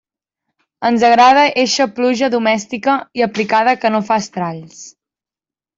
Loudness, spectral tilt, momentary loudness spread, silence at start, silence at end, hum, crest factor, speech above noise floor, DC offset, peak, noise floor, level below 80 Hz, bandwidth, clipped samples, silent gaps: -14 LUFS; -4 dB/octave; 13 LU; 0.8 s; 0.9 s; none; 14 dB; over 76 dB; under 0.1%; -2 dBFS; under -90 dBFS; -60 dBFS; 7.8 kHz; under 0.1%; none